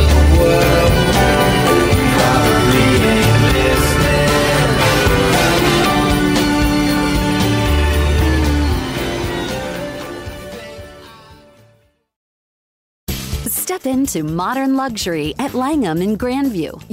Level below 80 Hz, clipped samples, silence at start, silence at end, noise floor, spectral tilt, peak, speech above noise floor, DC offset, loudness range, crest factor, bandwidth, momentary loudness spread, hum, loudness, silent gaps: -22 dBFS; under 0.1%; 0 s; 0.1 s; -55 dBFS; -5 dB/octave; 0 dBFS; 37 dB; under 0.1%; 15 LU; 14 dB; 16.5 kHz; 12 LU; none; -14 LUFS; 12.16-13.07 s